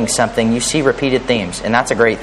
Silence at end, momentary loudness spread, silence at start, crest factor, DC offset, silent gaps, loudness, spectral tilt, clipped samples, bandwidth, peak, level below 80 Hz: 0 s; 3 LU; 0 s; 16 dB; under 0.1%; none; -15 LUFS; -3.5 dB/octave; under 0.1%; 13 kHz; 0 dBFS; -38 dBFS